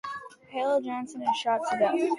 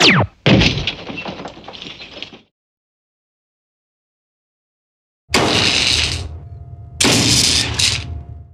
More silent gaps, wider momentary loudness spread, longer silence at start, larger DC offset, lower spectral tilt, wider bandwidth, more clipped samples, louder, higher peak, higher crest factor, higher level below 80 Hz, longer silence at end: second, none vs 2.51-5.28 s; second, 13 LU vs 22 LU; about the same, 0.05 s vs 0 s; neither; about the same, -4 dB/octave vs -3 dB/octave; second, 11.5 kHz vs 15 kHz; neither; second, -28 LUFS vs -14 LUFS; second, -12 dBFS vs 0 dBFS; about the same, 16 dB vs 18 dB; second, -74 dBFS vs -36 dBFS; about the same, 0 s vs 0.1 s